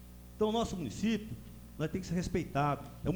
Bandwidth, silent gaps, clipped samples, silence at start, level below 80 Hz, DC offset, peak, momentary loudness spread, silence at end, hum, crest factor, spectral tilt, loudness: over 20 kHz; none; under 0.1%; 0 s; -50 dBFS; under 0.1%; -18 dBFS; 14 LU; 0 s; 60 Hz at -50 dBFS; 18 dB; -6 dB/octave; -35 LUFS